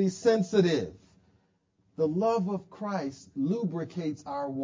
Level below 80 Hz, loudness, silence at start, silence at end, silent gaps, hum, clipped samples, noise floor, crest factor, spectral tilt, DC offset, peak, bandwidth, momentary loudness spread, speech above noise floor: -66 dBFS; -29 LUFS; 0 s; 0 s; none; none; under 0.1%; -71 dBFS; 18 dB; -6.5 dB/octave; under 0.1%; -10 dBFS; 7.6 kHz; 10 LU; 42 dB